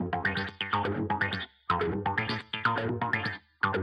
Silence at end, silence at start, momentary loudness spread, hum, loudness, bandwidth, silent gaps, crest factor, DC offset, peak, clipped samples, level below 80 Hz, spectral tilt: 0 s; 0 s; 3 LU; none; -30 LUFS; 10.5 kHz; none; 18 dB; under 0.1%; -12 dBFS; under 0.1%; -56 dBFS; -7 dB/octave